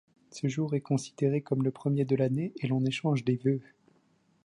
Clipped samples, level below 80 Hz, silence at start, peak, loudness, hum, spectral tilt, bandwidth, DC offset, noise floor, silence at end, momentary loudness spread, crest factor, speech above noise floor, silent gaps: under 0.1%; -72 dBFS; 0.35 s; -14 dBFS; -30 LUFS; none; -7.5 dB/octave; 11 kHz; under 0.1%; -68 dBFS; 0.85 s; 5 LU; 16 dB; 39 dB; none